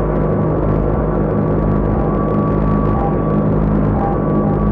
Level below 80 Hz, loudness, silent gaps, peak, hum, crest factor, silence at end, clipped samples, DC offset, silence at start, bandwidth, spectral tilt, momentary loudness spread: -22 dBFS; -16 LUFS; none; -6 dBFS; none; 8 dB; 0 s; under 0.1%; under 0.1%; 0 s; 3.7 kHz; -12 dB/octave; 1 LU